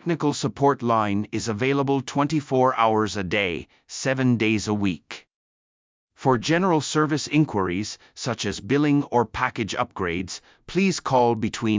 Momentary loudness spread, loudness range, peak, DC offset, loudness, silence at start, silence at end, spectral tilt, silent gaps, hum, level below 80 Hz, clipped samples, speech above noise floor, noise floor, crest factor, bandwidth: 9 LU; 3 LU; -6 dBFS; under 0.1%; -23 LUFS; 0.05 s; 0 s; -5.5 dB/octave; 5.34-6.08 s; none; -52 dBFS; under 0.1%; over 67 dB; under -90 dBFS; 18 dB; 7.6 kHz